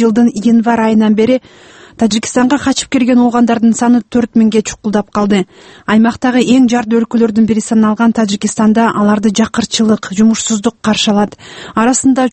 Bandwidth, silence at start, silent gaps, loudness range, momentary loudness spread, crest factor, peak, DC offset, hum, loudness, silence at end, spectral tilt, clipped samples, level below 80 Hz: 8.8 kHz; 0 s; none; 1 LU; 5 LU; 10 dB; 0 dBFS; under 0.1%; none; -11 LUFS; 0.05 s; -4.5 dB/octave; under 0.1%; -46 dBFS